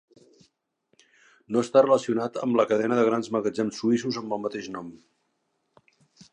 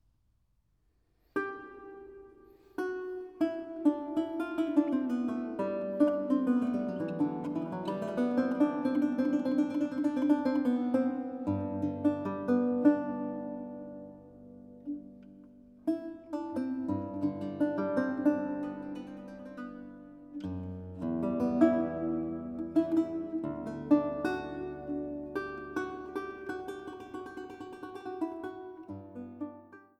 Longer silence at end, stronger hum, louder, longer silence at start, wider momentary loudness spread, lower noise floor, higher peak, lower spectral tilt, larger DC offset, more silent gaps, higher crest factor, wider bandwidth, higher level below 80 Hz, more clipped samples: first, 1.35 s vs 0.2 s; neither; first, -25 LUFS vs -33 LUFS; first, 1.5 s vs 1.35 s; second, 13 LU vs 17 LU; about the same, -75 dBFS vs -73 dBFS; first, -6 dBFS vs -12 dBFS; second, -5.5 dB/octave vs -8 dB/octave; neither; neither; about the same, 20 dB vs 22 dB; first, 10 kHz vs 8.4 kHz; second, -74 dBFS vs -66 dBFS; neither